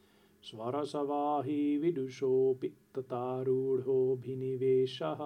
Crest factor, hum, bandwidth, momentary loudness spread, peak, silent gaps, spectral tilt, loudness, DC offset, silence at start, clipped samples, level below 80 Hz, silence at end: 12 dB; none; 9.8 kHz; 10 LU; -20 dBFS; none; -8 dB/octave; -33 LUFS; under 0.1%; 0.45 s; under 0.1%; -82 dBFS; 0 s